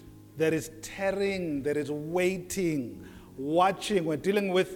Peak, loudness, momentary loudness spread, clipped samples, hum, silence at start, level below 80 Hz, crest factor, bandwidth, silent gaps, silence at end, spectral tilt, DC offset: -12 dBFS; -29 LUFS; 14 LU; under 0.1%; none; 0 s; -58 dBFS; 18 dB; 18.5 kHz; none; 0 s; -5 dB/octave; under 0.1%